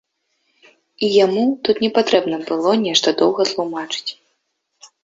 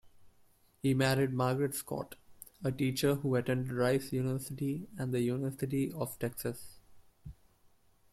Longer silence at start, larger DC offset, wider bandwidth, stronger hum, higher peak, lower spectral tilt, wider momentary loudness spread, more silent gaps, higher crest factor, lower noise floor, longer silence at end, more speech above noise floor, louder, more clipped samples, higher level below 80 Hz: first, 1 s vs 0.05 s; neither; second, 8 kHz vs 16 kHz; neither; first, -2 dBFS vs -16 dBFS; second, -3.5 dB/octave vs -6 dB/octave; second, 9 LU vs 15 LU; neither; about the same, 18 dB vs 18 dB; first, -71 dBFS vs -67 dBFS; second, 0.2 s vs 0.8 s; first, 54 dB vs 34 dB; first, -17 LUFS vs -34 LUFS; neither; about the same, -64 dBFS vs -62 dBFS